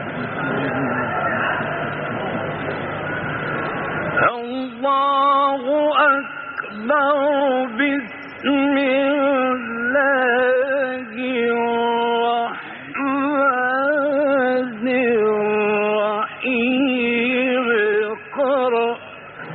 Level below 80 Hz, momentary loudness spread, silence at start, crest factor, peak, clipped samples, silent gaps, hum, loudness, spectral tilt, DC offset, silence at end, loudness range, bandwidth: -58 dBFS; 9 LU; 0 s; 14 dB; -6 dBFS; under 0.1%; none; none; -19 LUFS; -3 dB/octave; under 0.1%; 0 s; 4 LU; 4.5 kHz